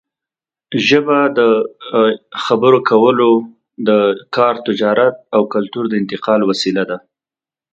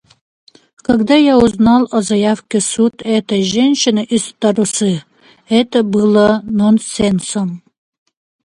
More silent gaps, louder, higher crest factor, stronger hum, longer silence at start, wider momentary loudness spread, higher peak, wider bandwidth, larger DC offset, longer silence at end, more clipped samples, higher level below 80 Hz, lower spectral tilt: neither; about the same, -14 LUFS vs -13 LUFS; about the same, 14 dB vs 14 dB; neither; second, 0.7 s vs 0.9 s; about the same, 8 LU vs 7 LU; about the same, 0 dBFS vs 0 dBFS; second, 8.2 kHz vs 11.5 kHz; neither; about the same, 0.75 s vs 0.85 s; neither; second, -62 dBFS vs -44 dBFS; about the same, -5.5 dB/octave vs -5 dB/octave